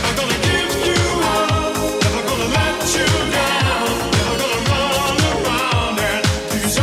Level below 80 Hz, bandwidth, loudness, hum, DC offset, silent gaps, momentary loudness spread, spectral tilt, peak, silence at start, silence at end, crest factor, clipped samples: -34 dBFS; 16.5 kHz; -17 LUFS; none; under 0.1%; none; 2 LU; -3.5 dB/octave; -2 dBFS; 0 s; 0 s; 14 dB; under 0.1%